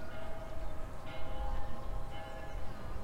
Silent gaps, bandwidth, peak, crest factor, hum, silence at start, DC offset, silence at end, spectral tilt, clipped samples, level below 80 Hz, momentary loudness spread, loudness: none; 10.5 kHz; -22 dBFS; 12 dB; none; 0 s; under 0.1%; 0 s; -6 dB/octave; under 0.1%; -42 dBFS; 4 LU; -45 LUFS